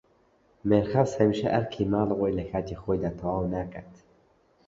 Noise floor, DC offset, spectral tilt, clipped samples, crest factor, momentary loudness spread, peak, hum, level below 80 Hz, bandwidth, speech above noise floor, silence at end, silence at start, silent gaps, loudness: -64 dBFS; under 0.1%; -8 dB/octave; under 0.1%; 20 dB; 10 LU; -8 dBFS; none; -50 dBFS; 7.8 kHz; 37 dB; 0.75 s; 0.65 s; none; -27 LUFS